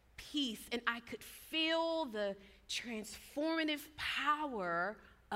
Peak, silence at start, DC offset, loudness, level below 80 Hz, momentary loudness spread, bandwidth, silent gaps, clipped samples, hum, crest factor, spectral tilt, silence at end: -16 dBFS; 0.2 s; under 0.1%; -38 LUFS; -68 dBFS; 11 LU; 16 kHz; none; under 0.1%; none; 22 dB; -3 dB/octave; 0 s